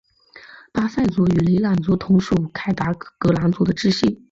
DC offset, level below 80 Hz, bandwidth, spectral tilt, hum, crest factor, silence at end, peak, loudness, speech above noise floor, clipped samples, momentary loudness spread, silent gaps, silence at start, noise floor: under 0.1%; -44 dBFS; 7.6 kHz; -7.5 dB/octave; none; 14 dB; 0.15 s; -6 dBFS; -20 LUFS; 28 dB; under 0.1%; 6 LU; none; 0.35 s; -46 dBFS